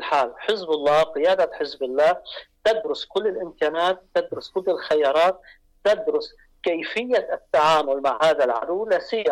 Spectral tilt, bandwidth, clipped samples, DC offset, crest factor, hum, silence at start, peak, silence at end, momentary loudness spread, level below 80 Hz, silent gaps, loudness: -4 dB/octave; 12.5 kHz; under 0.1%; under 0.1%; 10 dB; none; 0 s; -12 dBFS; 0 s; 8 LU; -60 dBFS; none; -22 LUFS